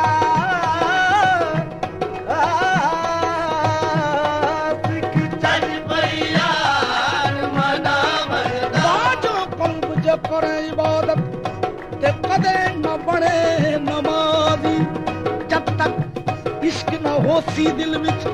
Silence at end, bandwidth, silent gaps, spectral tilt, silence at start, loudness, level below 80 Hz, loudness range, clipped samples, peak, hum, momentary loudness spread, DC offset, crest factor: 0 s; 12.5 kHz; none; -5.5 dB/octave; 0 s; -19 LUFS; -46 dBFS; 2 LU; under 0.1%; -4 dBFS; none; 6 LU; under 0.1%; 16 dB